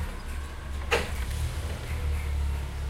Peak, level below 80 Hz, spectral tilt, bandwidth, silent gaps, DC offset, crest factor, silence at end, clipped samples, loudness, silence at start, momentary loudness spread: -10 dBFS; -32 dBFS; -5 dB/octave; 16 kHz; none; under 0.1%; 20 dB; 0 s; under 0.1%; -32 LUFS; 0 s; 10 LU